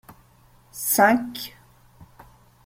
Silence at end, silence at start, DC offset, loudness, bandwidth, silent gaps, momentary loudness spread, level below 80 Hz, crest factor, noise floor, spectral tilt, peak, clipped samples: 0.6 s; 0.1 s; under 0.1%; -21 LUFS; 16.5 kHz; none; 20 LU; -60 dBFS; 22 dB; -55 dBFS; -3 dB/octave; -4 dBFS; under 0.1%